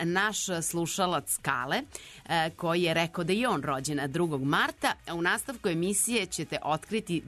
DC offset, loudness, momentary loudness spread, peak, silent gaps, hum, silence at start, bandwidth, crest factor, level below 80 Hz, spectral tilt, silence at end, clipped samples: under 0.1%; -29 LUFS; 5 LU; -10 dBFS; none; none; 0 s; 13.5 kHz; 20 dB; -60 dBFS; -3.5 dB/octave; 0 s; under 0.1%